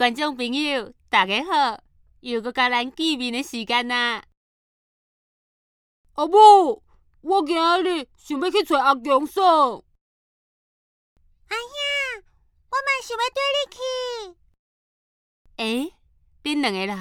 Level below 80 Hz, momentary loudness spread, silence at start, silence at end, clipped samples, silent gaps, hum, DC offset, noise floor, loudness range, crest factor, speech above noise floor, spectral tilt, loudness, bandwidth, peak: -62 dBFS; 14 LU; 0 s; 0 s; under 0.1%; 4.37-6.04 s, 10.01-11.16 s, 14.59-15.45 s; none; under 0.1%; -60 dBFS; 10 LU; 22 dB; 39 dB; -3 dB/octave; -21 LUFS; 16.5 kHz; -2 dBFS